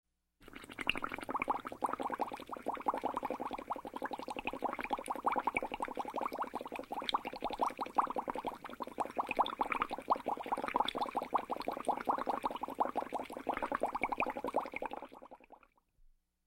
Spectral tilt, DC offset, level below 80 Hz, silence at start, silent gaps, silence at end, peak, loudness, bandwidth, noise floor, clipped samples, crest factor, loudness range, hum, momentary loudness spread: -4 dB/octave; under 0.1%; -64 dBFS; 0.4 s; none; 0.4 s; -14 dBFS; -38 LUFS; 16 kHz; -67 dBFS; under 0.1%; 24 dB; 3 LU; none; 8 LU